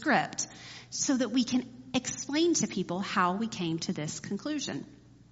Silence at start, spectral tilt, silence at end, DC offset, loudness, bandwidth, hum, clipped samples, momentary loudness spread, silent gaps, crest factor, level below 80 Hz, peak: 0 s; -3.5 dB/octave; 0.1 s; under 0.1%; -31 LUFS; 8 kHz; none; under 0.1%; 10 LU; none; 20 dB; -66 dBFS; -12 dBFS